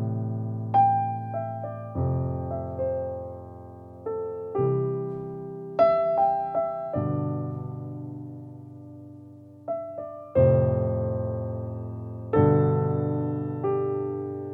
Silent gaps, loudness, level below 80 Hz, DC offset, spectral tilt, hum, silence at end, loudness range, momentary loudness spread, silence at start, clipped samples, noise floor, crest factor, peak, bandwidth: none; -27 LUFS; -52 dBFS; under 0.1%; -12 dB/octave; none; 0 s; 7 LU; 20 LU; 0 s; under 0.1%; -46 dBFS; 20 dB; -8 dBFS; 5 kHz